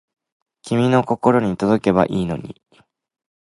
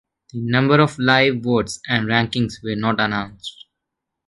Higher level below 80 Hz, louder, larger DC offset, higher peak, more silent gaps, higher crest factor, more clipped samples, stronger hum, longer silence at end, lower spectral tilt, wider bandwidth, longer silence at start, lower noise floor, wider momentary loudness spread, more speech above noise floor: about the same, -50 dBFS vs -50 dBFS; about the same, -18 LUFS vs -19 LUFS; neither; about the same, 0 dBFS vs 0 dBFS; neither; about the same, 20 dB vs 20 dB; neither; neither; first, 1.05 s vs 0.75 s; first, -7.5 dB/octave vs -5.5 dB/octave; about the same, 11.5 kHz vs 11.5 kHz; first, 0.65 s vs 0.35 s; second, -58 dBFS vs -81 dBFS; second, 9 LU vs 15 LU; second, 40 dB vs 62 dB